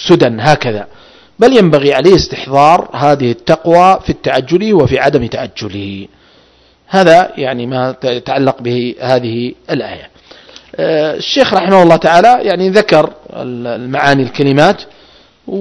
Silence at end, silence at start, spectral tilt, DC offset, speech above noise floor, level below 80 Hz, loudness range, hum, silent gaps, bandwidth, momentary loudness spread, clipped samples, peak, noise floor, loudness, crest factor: 0 s; 0 s; -6 dB/octave; under 0.1%; 37 dB; -40 dBFS; 6 LU; none; none; 11 kHz; 14 LU; 2%; 0 dBFS; -47 dBFS; -10 LUFS; 10 dB